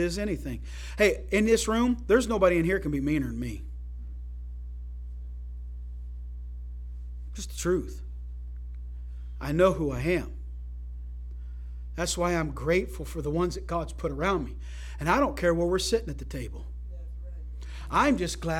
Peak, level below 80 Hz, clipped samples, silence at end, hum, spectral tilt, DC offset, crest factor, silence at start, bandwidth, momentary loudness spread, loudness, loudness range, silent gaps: -8 dBFS; -38 dBFS; under 0.1%; 0 s; 60 Hz at -35 dBFS; -5.5 dB/octave; under 0.1%; 20 dB; 0 s; 16.5 kHz; 17 LU; -27 LUFS; 12 LU; none